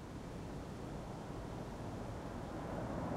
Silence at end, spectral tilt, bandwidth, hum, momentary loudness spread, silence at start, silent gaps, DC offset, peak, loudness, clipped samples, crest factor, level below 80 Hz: 0 s; -7 dB/octave; 16 kHz; none; 4 LU; 0 s; none; under 0.1%; -30 dBFS; -46 LUFS; under 0.1%; 14 dB; -54 dBFS